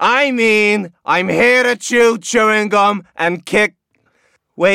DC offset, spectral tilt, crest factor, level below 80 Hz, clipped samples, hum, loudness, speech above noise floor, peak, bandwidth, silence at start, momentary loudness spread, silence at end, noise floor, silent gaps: 0.2%; -3.5 dB/octave; 12 dB; -56 dBFS; under 0.1%; none; -13 LUFS; 46 dB; -2 dBFS; 15.5 kHz; 0 s; 7 LU; 0 s; -60 dBFS; none